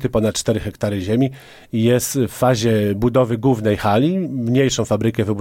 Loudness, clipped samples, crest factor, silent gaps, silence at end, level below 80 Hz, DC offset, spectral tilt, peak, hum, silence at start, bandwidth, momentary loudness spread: -18 LUFS; under 0.1%; 14 dB; none; 0 s; -44 dBFS; under 0.1%; -6 dB/octave; -4 dBFS; none; 0 s; 17 kHz; 5 LU